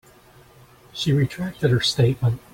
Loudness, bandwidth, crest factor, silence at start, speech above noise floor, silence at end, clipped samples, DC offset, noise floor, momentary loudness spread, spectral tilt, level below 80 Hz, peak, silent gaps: -21 LUFS; 16.5 kHz; 16 dB; 0.95 s; 30 dB; 0.15 s; under 0.1%; under 0.1%; -51 dBFS; 7 LU; -6 dB/octave; -50 dBFS; -6 dBFS; none